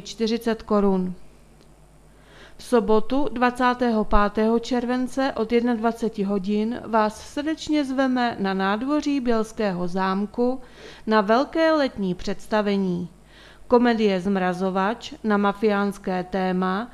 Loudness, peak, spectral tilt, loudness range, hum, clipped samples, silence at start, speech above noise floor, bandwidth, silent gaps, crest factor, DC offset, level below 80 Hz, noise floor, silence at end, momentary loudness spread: -23 LUFS; -2 dBFS; -6.5 dB/octave; 2 LU; none; under 0.1%; 0 s; 29 dB; 13 kHz; none; 20 dB; under 0.1%; -42 dBFS; -51 dBFS; 0 s; 7 LU